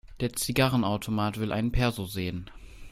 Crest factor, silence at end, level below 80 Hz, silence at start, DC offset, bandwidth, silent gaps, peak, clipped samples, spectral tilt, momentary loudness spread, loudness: 18 dB; 0 s; -40 dBFS; 0.05 s; under 0.1%; 16 kHz; none; -10 dBFS; under 0.1%; -5 dB/octave; 10 LU; -28 LUFS